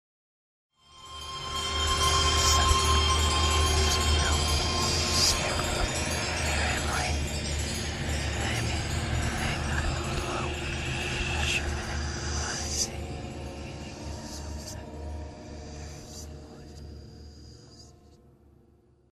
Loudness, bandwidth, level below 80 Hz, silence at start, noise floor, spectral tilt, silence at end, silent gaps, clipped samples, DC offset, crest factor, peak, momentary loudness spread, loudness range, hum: -27 LUFS; 14 kHz; -34 dBFS; 0.9 s; -61 dBFS; -3 dB/octave; 1.2 s; none; under 0.1%; under 0.1%; 20 dB; -10 dBFS; 19 LU; 18 LU; none